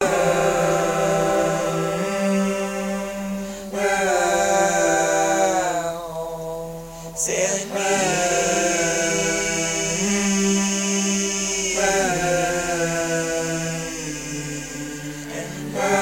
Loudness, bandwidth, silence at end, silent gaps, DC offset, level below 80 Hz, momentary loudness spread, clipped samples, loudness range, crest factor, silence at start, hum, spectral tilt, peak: -21 LUFS; 16.5 kHz; 0 s; none; under 0.1%; -46 dBFS; 11 LU; under 0.1%; 3 LU; 16 dB; 0 s; none; -3 dB/octave; -6 dBFS